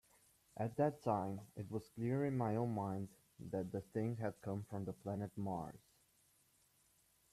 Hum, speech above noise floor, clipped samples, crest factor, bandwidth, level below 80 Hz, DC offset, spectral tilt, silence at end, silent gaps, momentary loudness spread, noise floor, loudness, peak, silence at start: none; 33 dB; under 0.1%; 20 dB; 14.5 kHz; -74 dBFS; under 0.1%; -8.5 dB/octave; 1.55 s; none; 9 LU; -75 dBFS; -42 LUFS; -24 dBFS; 0.55 s